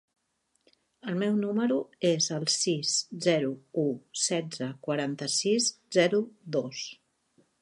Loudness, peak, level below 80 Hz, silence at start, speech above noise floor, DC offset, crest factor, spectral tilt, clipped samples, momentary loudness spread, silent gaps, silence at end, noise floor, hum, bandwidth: -28 LUFS; -10 dBFS; -80 dBFS; 1.05 s; 47 dB; under 0.1%; 20 dB; -3.5 dB/octave; under 0.1%; 9 LU; none; 0.7 s; -76 dBFS; none; 11.5 kHz